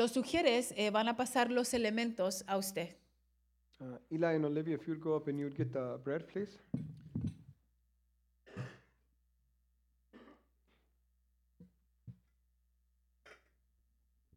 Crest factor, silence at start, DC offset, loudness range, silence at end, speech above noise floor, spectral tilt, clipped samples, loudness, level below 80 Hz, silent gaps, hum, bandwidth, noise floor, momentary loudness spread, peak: 22 dB; 0 s; under 0.1%; 22 LU; 1.05 s; 40 dB; -4.5 dB/octave; under 0.1%; -36 LUFS; -70 dBFS; none; none; 16.5 kHz; -76 dBFS; 16 LU; -16 dBFS